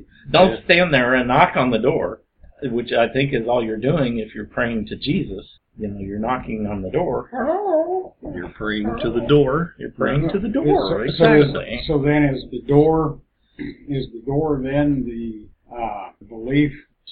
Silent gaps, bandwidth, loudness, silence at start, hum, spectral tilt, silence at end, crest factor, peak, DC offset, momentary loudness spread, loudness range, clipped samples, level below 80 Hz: none; 5.2 kHz; -19 LUFS; 0.25 s; none; -10 dB/octave; 0 s; 20 dB; 0 dBFS; under 0.1%; 16 LU; 6 LU; under 0.1%; -40 dBFS